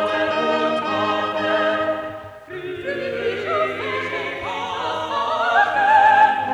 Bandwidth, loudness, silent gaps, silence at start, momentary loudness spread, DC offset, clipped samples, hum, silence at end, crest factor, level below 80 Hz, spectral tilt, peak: 10.5 kHz; -20 LUFS; none; 0 s; 14 LU; under 0.1%; under 0.1%; none; 0 s; 16 dB; -58 dBFS; -4.5 dB/octave; -4 dBFS